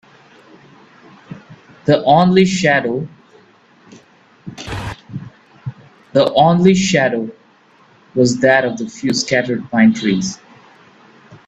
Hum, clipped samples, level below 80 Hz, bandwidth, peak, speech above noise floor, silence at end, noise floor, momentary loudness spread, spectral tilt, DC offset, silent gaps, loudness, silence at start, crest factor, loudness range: none; under 0.1%; -50 dBFS; 8.6 kHz; 0 dBFS; 37 dB; 0.1 s; -50 dBFS; 21 LU; -5.5 dB/octave; under 0.1%; none; -15 LUFS; 1.3 s; 16 dB; 7 LU